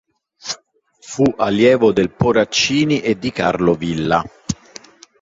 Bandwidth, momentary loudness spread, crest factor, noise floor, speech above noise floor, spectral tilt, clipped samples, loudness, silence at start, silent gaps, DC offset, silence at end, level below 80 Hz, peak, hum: 7.8 kHz; 14 LU; 16 dB; -52 dBFS; 37 dB; -5 dB/octave; under 0.1%; -16 LUFS; 0.45 s; none; under 0.1%; 0.65 s; -46 dBFS; -2 dBFS; none